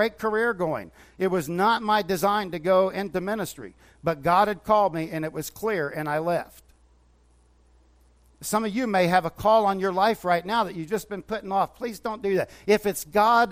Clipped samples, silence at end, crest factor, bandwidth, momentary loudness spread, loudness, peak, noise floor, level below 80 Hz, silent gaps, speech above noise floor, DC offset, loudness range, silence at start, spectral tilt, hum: under 0.1%; 0 s; 18 dB; 16 kHz; 10 LU; -25 LUFS; -6 dBFS; -59 dBFS; -56 dBFS; none; 35 dB; under 0.1%; 6 LU; 0 s; -5 dB/octave; none